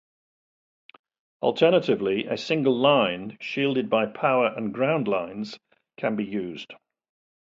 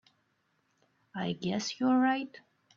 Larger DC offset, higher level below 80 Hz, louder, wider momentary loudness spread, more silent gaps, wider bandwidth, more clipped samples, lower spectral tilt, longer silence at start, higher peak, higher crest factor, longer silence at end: neither; first, -68 dBFS vs -76 dBFS; first, -24 LUFS vs -31 LUFS; about the same, 15 LU vs 15 LU; neither; about the same, 7.6 kHz vs 7.4 kHz; neither; first, -6.5 dB/octave vs -5 dB/octave; first, 1.4 s vs 1.15 s; first, -6 dBFS vs -18 dBFS; about the same, 20 dB vs 16 dB; first, 0.8 s vs 0.4 s